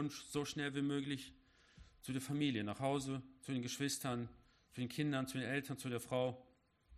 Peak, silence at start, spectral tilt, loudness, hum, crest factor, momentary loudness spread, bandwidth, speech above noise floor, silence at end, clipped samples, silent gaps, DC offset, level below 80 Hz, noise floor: -24 dBFS; 0 s; -5 dB/octave; -41 LUFS; none; 18 dB; 8 LU; 14 kHz; 26 dB; 0 s; under 0.1%; none; under 0.1%; -72 dBFS; -67 dBFS